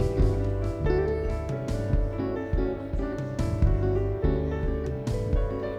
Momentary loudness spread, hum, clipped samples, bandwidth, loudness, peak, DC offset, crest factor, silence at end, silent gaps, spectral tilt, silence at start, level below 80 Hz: 5 LU; none; under 0.1%; 10 kHz; -28 LUFS; -12 dBFS; under 0.1%; 14 dB; 0 s; none; -8.5 dB/octave; 0 s; -30 dBFS